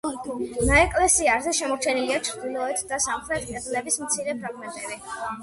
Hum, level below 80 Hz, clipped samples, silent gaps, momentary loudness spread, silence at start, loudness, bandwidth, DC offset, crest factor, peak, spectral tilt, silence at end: none; -40 dBFS; under 0.1%; none; 14 LU; 0.05 s; -24 LUFS; 12 kHz; under 0.1%; 20 dB; -6 dBFS; -2.5 dB/octave; 0 s